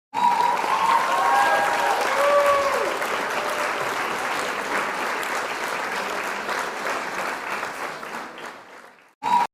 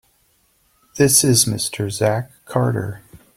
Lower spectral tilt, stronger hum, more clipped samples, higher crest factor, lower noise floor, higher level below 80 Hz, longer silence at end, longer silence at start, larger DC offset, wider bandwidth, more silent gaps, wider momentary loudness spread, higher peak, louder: second, -2 dB/octave vs -4 dB/octave; neither; neither; about the same, 16 dB vs 20 dB; second, -46 dBFS vs -61 dBFS; second, -64 dBFS vs -52 dBFS; second, 0.05 s vs 0.2 s; second, 0.15 s vs 0.95 s; neither; about the same, 16 kHz vs 16.5 kHz; first, 9.15-9.21 s vs none; second, 12 LU vs 17 LU; second, -8 dBFS vs 0 dBFS; second, -23 LUFS vs -17 LUFS